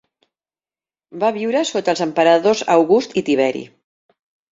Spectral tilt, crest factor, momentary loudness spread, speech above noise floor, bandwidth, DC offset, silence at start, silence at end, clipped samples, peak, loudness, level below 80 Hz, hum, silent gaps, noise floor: -4.5 dB/octave; 18 dB; 7 LU; over 74 dB; 8 kHz; under 0.1%; 1.15 s; 0.85 s; under 0.1%; -2 dBFS; -17 LUFS; -64 dBFS; none; none; under -90 dBFS